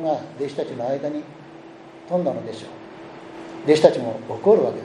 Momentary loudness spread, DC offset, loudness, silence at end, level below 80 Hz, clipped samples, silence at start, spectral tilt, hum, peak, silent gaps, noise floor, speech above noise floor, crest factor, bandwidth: 25 LU; under 0.1%; -22 LUFS; 0 s; -68 dBFS; under 0.1%; 0 s; -6.5 dB/octave; none; 0 dBFS; none; -42 dBFS; 21 dB; 22 dB; 11 kHz